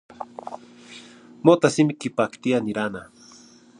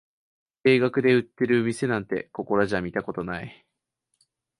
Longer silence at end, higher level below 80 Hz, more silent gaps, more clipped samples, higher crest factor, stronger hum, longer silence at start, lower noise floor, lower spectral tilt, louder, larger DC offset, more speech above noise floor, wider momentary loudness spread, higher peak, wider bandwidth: second, 0.75 s vs 1.1 s; second, -66 dBFS vs -58 dBFS; neither; neither; first, 24 dB vs 18 dB; neither; second, 0.2 s vs 0.65 s; second, -50 dBFS vs -79 dBFS; about the same, -6 dB/octave vs -6.5 dB/octave; about the same, -22 LUFS vs -24 LUFS; neither; second, 28 dB vs 55 dB; first, 25 LU vs 11 LU; first, 0 dBFS vs -8 dBFS; about the same, 10.5 kHz vs 11.5 kHz